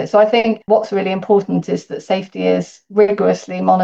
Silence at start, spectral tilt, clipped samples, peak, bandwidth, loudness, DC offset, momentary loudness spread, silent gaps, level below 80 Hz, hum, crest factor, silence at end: 0 s; -6.5 dB/octave; under 0.1%; -2 dBFS; 8 kHz; -16 LUFS; under 0.1%; 7 LU; none; -62 dBFS; none; 14 dB; 0 s